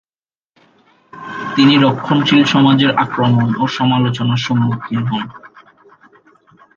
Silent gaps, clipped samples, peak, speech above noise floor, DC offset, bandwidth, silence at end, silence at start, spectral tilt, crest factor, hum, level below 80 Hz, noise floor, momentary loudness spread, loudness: none; under 0.1%; 0 dBFS; over 77 dB; under 0.1%; 7.2 kHz; 1.3 s; 1.15 s; -6.5 dB/octave; 16 dB; none; -56 dBFS; under -90 dBFS; 12 LU; -14 LUFS